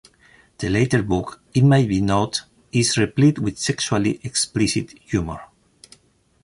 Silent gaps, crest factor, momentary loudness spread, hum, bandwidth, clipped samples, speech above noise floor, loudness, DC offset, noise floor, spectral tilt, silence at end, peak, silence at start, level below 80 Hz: none; 16 dB; 9 LU; none; 11.5 kHz; under 0.1%; 39 dB; -20 LUFS; under 0.1%; -58 dBFS; -5 dB/octave; 1 s; -4 dBFS; 0.6 s; -44 dBFS